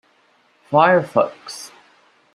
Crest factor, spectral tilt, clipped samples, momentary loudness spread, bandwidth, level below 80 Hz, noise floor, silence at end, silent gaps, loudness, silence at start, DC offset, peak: 20 dB; -5.5 dB/octave; under 0.1%; 20 LU; 13 kHz; -68 dBFS; -58 dBFS; 0.7 s; none; -17 LUFS; 0.7 s; under 0.1%; -2 dBFS